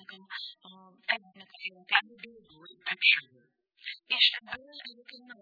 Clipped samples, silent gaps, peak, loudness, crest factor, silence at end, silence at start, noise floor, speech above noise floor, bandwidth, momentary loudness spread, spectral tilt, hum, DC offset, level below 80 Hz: under 0.1%; none; -8 dBFS; -27 LUFS; 26 dB; 0.1 s; 0.1 s; -55 dBFS; 24 dB; 5 kHz; 23 LU; -1.5 dB/octave; none; under 0.1%; -80 dBFS